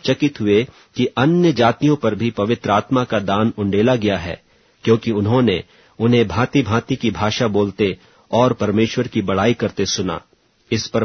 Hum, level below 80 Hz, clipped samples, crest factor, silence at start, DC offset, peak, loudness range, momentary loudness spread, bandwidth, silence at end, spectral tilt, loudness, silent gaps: none; -48 dBFS; under 0.1%; 18 dB; 0.05 s; under 0.1%; 0 dBFS; 2 LU; 7 LU; 6.6 kHz; 0 s; -6 dB/octave; -18 LUFS; none